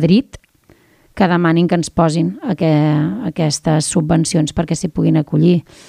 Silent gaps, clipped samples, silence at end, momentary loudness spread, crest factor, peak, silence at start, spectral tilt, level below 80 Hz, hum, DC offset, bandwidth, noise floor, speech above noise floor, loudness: none; under 0.1%; 0.3 s; 5 LU; 14 dB; -2 dBFS; 0 s; -6 dB/octave; -42 dBFS; none; under 0.1%; 11.5 kHz; -51 dBFS; 37 dB; -15 LUFS